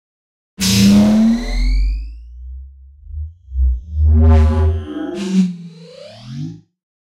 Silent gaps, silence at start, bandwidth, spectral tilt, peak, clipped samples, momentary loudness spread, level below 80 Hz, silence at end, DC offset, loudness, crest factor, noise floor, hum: none; 0.6 s; 15.5 kHz; -6 dB/octave; -2 dBFS; under 0.1%; 24 LU; -20 dBFS; 0.5 s; under 0.1%; -15 LUFS; 14 dB; -37 dBFS; none